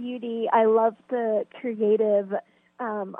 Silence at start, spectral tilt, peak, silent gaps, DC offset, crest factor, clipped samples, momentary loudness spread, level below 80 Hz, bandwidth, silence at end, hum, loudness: 0 s; -9 dB/octave; -10 dBFS; none; under 0.1%; 16 dB; under 0.1%; 12 LU; -82 dBFS; 3.7 kHz; 0 s; none; -24 LUFS